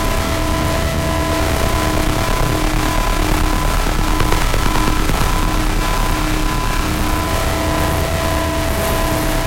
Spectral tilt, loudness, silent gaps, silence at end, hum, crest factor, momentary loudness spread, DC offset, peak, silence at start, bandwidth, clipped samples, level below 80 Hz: -4.5 dB/octave; -18 LUFS; none; 0 s; none; 14 dB; 1 LU; under 0.1%; 0 dBFS; 0 s; 16.5 kHz; under 0.1%; -20 dBFS